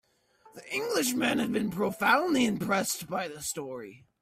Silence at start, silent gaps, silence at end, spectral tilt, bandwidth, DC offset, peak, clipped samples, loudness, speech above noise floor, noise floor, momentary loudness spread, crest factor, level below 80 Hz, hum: 0.55 s; none; 0.25 s; -3.5 dB/octave; 16 kHz; under 0.1%; -10 dBFS; under 0.1%; -28 LUFS; 32 dB; -62 dBFS; 12 LU; 20 dB; -66 dBFS; none